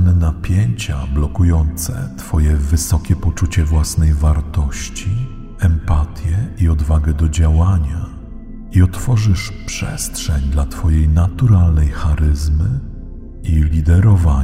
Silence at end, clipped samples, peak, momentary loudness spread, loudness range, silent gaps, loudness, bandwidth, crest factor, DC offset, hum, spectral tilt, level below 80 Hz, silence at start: 0 s; under 0.1%; 0 dBFS; 10 LU; 2 LU; none; -16 LUFS; 15.5 kHz; 14 dB; under 0.1%; none; -6 dB/octave; -18 dBFS; 0 s